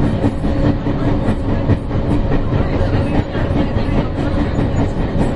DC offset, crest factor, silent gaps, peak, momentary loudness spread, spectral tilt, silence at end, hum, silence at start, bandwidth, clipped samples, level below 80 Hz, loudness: under 0.1%; 14 dB; none; 0 dBFS; 2 LU; -8.5 dB/octave; 0 s; none; 0 s; 10.5 kHz; under 0.1%; -22 dBFS; -18 LUFS